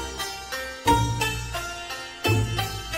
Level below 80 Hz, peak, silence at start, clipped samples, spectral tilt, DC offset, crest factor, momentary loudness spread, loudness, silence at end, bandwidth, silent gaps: -38 dBFS; -8 dBFS; 0 s; under 0.1%; -4 dB/octave; under 0.1%; 20 dB; 10 LU; -26 LUFS; 0 s; 16 kHz; none